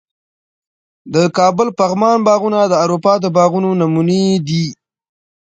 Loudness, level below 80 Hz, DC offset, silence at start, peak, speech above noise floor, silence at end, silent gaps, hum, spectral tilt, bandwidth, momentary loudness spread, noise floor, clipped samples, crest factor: -14 LUFS; -58 dBFS; under 0.1%; 1.05 s; 0 dBFS; over 77 dB; 0.85 s; none; none; -6.5 dB/octave; 9 kHz; 4 LU; under -90 dBFS; under 0.1%; 14 dB